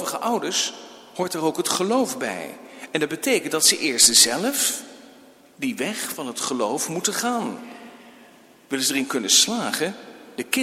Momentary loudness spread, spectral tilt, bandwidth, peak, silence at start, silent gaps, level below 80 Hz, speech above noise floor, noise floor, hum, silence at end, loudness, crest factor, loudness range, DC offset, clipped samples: 18 LU; -1 dB/octave; 16.5 kHz; -2 dBFS; 0 s; none; -68 dBFS; 28 dB; -50 dBFS; none; 0 s; -21 LUFS; 22 dB; 8 LU; under 0.1%; under 0.1%